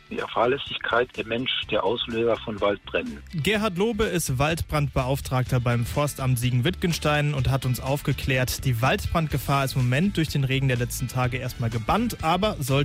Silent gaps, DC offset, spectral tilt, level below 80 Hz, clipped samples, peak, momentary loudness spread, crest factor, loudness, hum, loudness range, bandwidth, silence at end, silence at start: none; under 0.1%; -5.5 dB/octave; -40 dBFS; under 0.1%; -10 dBFS; 4 LU; 14 dB; -25 LUFS; none; 1 LU; 16 kHz; 0 s; 0.1 s